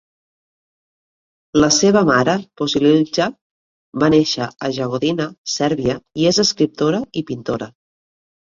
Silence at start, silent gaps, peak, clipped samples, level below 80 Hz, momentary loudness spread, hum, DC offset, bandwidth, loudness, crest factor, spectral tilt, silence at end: 1.55 s; 3.41-3.92 s, 5.38-5.45 s; -2 dBFS; under 0.1%; -50 dBFS; 11 LU; none; under 0.1%; 7.6 kHz; -17 LUFS; 18 dB; -4.5 dB/octave; 0.75 s